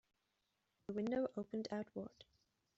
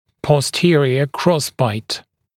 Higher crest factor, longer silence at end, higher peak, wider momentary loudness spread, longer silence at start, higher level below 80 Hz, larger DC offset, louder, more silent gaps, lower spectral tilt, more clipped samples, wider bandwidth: about the same, 18 dB vs 18 dB; first, 0.55 s vs 0.35 s; second, -30 dBFS vs 0 dBFS; first, 13 LU vs 10 LU; first, 0.9 s vs 0.25 s; second, -78 dBFS vs -54 dBFS; neither; second, -44 LUFS vs -17 LUFS; neither; about the same, -6 dB/octave vs -5.5 dB/octave; neither; second, 8 kHz vs 16 kHz